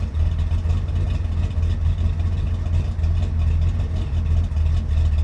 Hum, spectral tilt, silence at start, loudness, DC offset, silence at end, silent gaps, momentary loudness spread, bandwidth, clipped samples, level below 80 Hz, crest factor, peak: none; -8 dB/octave; 0 s; -23 LUFS; under 0.1%; 0 s; none; 3 LU; 6.4 kHz; under 0.1%; -24 dBFS; 10 dB; -10 dBFS